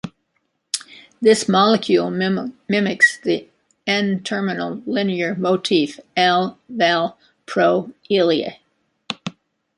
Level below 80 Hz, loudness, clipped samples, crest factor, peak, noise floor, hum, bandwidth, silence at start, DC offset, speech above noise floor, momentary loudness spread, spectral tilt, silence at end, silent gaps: -66 dBFS; -19 LUFS; under 0.1%; 20 dB; 0 dBFS; -70 dBFS; none; 11.5 kHz; 0.05 s; under 0.1%; 52 dB; 12 LU; -4.5 dB/octave; 0.45 s; none